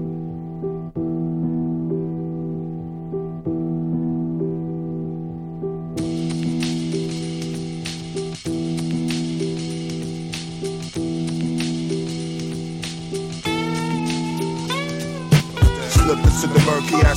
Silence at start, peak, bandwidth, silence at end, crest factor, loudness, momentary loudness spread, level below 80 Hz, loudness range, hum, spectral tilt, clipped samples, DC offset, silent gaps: 0 s; -2 dBFS; 16 kHz; 0 s; 20 dB; -23 LUFS; 12 LU; -30 dBFS; 6 LU; none; -6 dB/octave; under 0.1%; under 0.1%; none